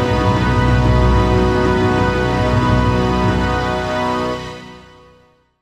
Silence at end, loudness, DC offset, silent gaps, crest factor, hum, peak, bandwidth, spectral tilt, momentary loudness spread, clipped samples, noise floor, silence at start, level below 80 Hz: 0.8 s; -16 LUFS; under 0.1%; none; 14 dB; none; -2 dBFS; 10.5 kHz; -7 dB/octave; 6 LU; under 0.1%; -52 dBFS; 0 s; -24 dBFS